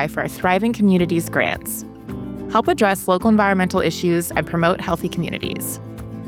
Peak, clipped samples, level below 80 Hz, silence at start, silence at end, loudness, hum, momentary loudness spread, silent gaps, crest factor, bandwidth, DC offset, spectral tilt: -4 dBFS; under 0.1%; -44 dBFS; 0 s; 0 s; -19 LUFS; none; 13 LU; none; 16 dB; 17.5 kHz; under 0.1%; -5.5 dB/octave